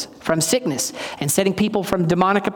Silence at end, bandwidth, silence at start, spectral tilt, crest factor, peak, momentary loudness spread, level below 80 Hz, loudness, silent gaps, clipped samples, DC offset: 0 s; 18 kHz; 0 s; -4 dB/octave; 16 dB; -4 dBFS; 6 LU; -52 dBFS; -20 LUFS; none; under 0.1%; under 0.1%